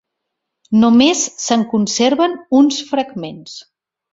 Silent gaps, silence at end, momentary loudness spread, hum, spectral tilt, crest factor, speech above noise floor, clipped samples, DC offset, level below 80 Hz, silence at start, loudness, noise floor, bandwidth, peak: none; 0.55 s; 18 LU; none; -3.5 dB/octave; 14 dB; 62 dB; under 0.1%; under 0.1%; -58 dBFS; 0.7 s; -14 LUFS; -77 dBFS; 8 kHz; -2 dBFS